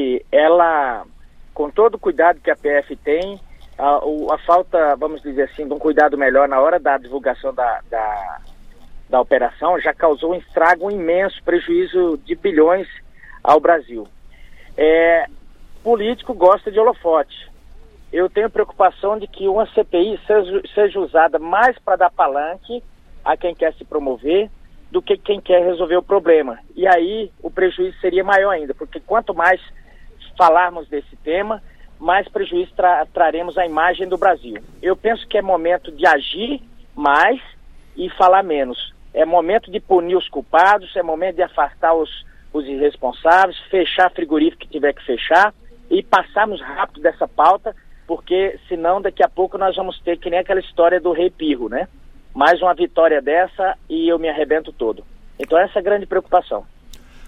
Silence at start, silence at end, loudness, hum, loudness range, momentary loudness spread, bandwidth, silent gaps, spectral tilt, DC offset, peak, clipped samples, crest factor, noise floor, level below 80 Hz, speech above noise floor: 0 s; 0 s; -17 LUFS; none; 2 LU; 12 LU; 8.8 kHz; none; -5.5 dB/octave; under 0.1%; 0 dBFS; under 0.1%; 16 dB; -40 dBFS; -42 dBFS; 24 dB